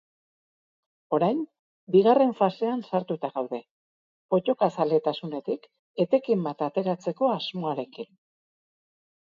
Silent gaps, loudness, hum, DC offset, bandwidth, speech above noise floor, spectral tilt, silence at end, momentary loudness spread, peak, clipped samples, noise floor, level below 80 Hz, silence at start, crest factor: 1.59-1.87 s, 3.71-4.29 s, 5.79-5.94 s; -26 LUFS; none; under 0.1%; 7.2 kHz; over 65 dB; -8 dB/octave; 1.15 s; 13 LU; -8 dBFS; under 0.1%; under -90 dBFS; -78 dBFS; 1.1 s; 20 dB